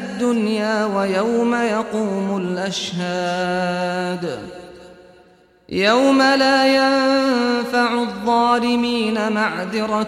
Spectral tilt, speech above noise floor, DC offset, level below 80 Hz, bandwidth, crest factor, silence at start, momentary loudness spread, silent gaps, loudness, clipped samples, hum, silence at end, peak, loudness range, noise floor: -4.5 dB/octave; 33 dB; under 0.1%; -56 dBFS; 14 kHz; 14 dB; 0 s; 9 LU; none; -18 LUFS; under 0.1%; none; 0 s; -4 dBFS; 7 LU; -52 dBFS